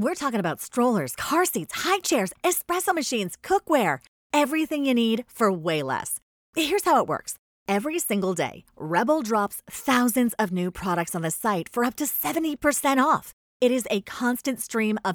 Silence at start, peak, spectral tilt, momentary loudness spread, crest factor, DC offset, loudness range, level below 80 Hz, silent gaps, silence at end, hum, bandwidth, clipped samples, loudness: 0 s; -8 dBFS; -4 dB/octave; 7 LU; 18 dB; under 0.1%; 1 LU; -60 dBFS; 4.08-4.30 s, 6.22-6.53 s, 7.39-7.66 s, 13.33-13.60 s; 0 s; none; over 20 kHz; under 0.1%; -25 LUFS